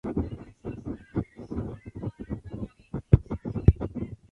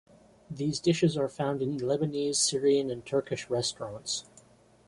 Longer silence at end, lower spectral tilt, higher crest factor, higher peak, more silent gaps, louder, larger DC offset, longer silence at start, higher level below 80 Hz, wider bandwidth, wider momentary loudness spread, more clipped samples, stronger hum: second, 0.15 s vs 0.65 s; first, -11 dB/octave vs -4.5 dB/octave; first, 26 dB vs 16 dB; first, -4 dBFS vs -14 dBFS; neither; about the same, -30 LUFS vs -29 LUFS; neither; second, 0.05 s vs 0.5 s; first, -36 dBFS vs -64 dBFS; second, 4.3 kHz vs 11.5 kHz; first, 16 LU vs 8 LU; neither; neither